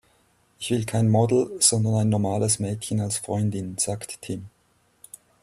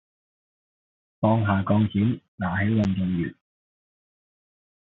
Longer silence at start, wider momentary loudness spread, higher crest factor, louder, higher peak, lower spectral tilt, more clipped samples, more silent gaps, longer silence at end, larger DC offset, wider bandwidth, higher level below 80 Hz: second, 0.6 s vs 1.2 s; first, 14 LU vs 7 LU; about the same, 20 dB vs 18 dB; about the same, -23 LUFS vs -24 LUFS; first, -4 dBFS vs -8 dBFS; second, -5 dB/octave vs -7.5 dB/octave; neither; second, none vs 2.28-2.38 s; second, 0.95 s vs 1.55 s; neither; first, 14 kHz vs 6.2 kHz; about the same, -58 dBFS vs -58 dBFS